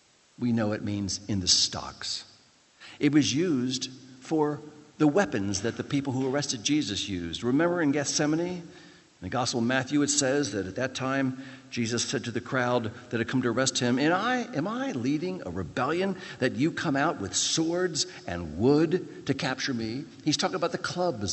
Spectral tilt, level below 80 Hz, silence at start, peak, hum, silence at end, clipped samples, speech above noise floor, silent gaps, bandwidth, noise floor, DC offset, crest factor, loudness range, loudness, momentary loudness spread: -4 dB/octave; -62 dBFS; 0.4 s; -8 dBFS; none; 0 s; under 0.1%; 32 dB; none; 8.6 kHz; -59 dBFS; under 0.1%; 20 dB; 2 LU; -28 LUFS; 9 LU